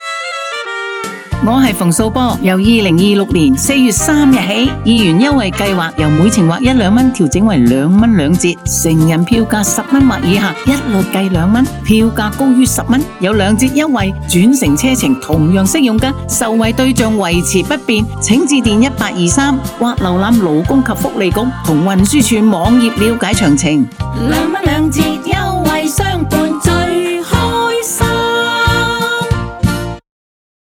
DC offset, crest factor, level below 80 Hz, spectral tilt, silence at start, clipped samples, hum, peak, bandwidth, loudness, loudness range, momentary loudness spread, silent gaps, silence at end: under 0.1%; 12 dB; -28 dBFS; -5 dB/octave; 0 s; under 0.1%; none; 0 dBFS; over 20 kHz; -11 LUFS; 3 LU; 5 LU; none; 0.6 s